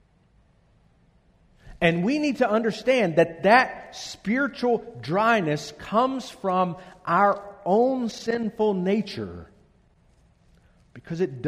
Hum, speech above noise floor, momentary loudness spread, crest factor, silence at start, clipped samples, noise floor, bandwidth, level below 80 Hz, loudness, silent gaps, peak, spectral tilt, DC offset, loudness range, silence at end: none; 37 dB; 12 LU; 22 dB; 1.65 s; under 0.1%; -61 dBFS; 13.5 kHz; -58 dBFS; -24 LUFS; none; -4 dBFS; -6 dB/octave; under 0.1%; 4 LU; 0 s